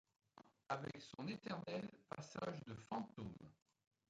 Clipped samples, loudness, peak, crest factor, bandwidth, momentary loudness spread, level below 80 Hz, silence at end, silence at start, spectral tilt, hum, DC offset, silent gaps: under 0.1%; -50 LUFS; -30 dBFS; 22 dB; 9.6 kHz; 17 LU; -78 dBFS; 0.55 s; 0.35 s; -6 dB/octave; none; under 0.1%; none